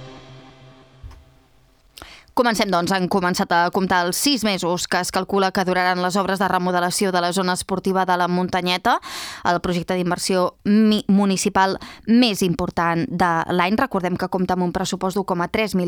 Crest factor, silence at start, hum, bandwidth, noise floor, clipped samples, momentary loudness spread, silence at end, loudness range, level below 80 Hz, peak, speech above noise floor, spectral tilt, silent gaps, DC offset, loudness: 18 dB; 0 s; none; over 20 kHz; -55 dBFS; under 0.1%; 5 LU; 0 s; 2 LU; -50 dBFS; -2 dBFS; 35 dB; -4.5 dB/octave; none; under 0.1%; -20 LUFS